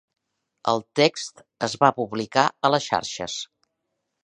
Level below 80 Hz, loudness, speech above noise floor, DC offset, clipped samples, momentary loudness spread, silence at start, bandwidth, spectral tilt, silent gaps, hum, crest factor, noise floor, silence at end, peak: -64 dBFS; -23 LUFS; 55 dB; under 0.1%; under 0.1%; 12 LU; 0.65 s; 10.5 kHz; -4 dB/octave; none; none; 22 dB; -79 dBFS; 0.8 s; -2 dBFS